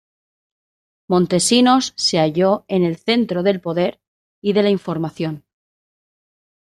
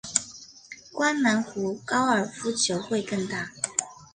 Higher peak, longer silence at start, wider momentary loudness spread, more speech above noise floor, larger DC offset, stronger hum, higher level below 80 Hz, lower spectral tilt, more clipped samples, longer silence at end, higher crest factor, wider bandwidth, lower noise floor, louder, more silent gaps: about the same, -2 dBFS vs -4 dBFS; first, 1.1 s vs 0.05 s; second, 11 LU vs 17 LU; first, over 73 dB vs 21 dB; neither; neither; first, -60 dBFS vs -66 dBFS; first, -4.5 dB/octave vs -3 dB/octave; neither; first, 1.35 s vs 0.1 s; second, 18 dB vs 24 dB; first, 13 kHz vs 10.5 kHz; first, under -90 dBFS vs -47 dBFS; first, -18 LUFS vs -26 LUFS; first, 4.07-4.42 s vs none